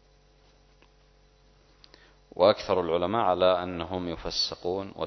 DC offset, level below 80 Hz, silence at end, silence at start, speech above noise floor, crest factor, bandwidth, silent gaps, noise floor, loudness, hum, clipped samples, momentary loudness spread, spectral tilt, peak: under 0.1%; -54 dBFS; 0 s; 2.35 s; 34 dB; 22 dB; 6.4 kHz; none; -60 dBFS; -26 LUFS; none; under 0.1%; 10 LU; -5 dB/octave; -6 dBFS